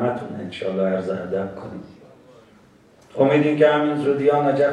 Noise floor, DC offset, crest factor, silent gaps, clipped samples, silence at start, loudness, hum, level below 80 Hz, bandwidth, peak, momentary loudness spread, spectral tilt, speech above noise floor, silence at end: -52 dBFS; under 0.1%; 18 dB; none; under 0.1%; 0 s; -20 LUFS; none; -62 dBFS; 9.8 kHz; -4 dBFS; 18 LU; -7.5 dB/octave; 32 dB; 0 s